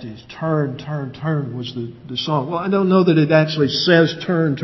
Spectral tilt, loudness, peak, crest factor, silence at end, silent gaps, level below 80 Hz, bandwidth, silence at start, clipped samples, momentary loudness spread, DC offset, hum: -7 dB/octave; -18 LUFS; 0 dBFS; 18 dB; 0 s; none; -56 dBFS; 6.2 kHz; 0 s; under 0.1%; 13 LU; under 0.1%; none